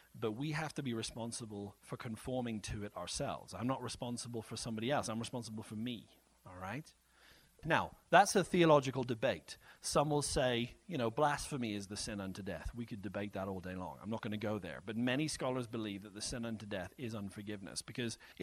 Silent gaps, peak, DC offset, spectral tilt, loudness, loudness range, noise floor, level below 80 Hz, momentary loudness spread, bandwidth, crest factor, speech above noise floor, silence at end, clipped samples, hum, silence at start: none; -12 dBFS; under 0.1%; -4.5 dB/octave; -38 LUFS; 9 LU; -65 dBFS; -60 dBFS; 14 LU; 15.5 kHz; 26 dB; 27 dB; 0 s; under 0.1%; none; 0.15 s